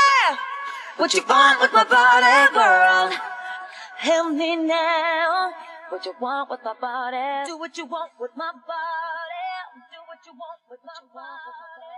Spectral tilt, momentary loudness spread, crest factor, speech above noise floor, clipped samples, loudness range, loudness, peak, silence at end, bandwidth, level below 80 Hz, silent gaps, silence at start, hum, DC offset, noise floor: -0.5 dB/octave; 20 LU; 18 dB; 25 dB; under 0.1%; 17 LU; -19 LUFS; -2 dBFS; 0 s; 12.5 kHz; -88 dBFS; none; 0 s; none; under 0.1%; -45 dBFS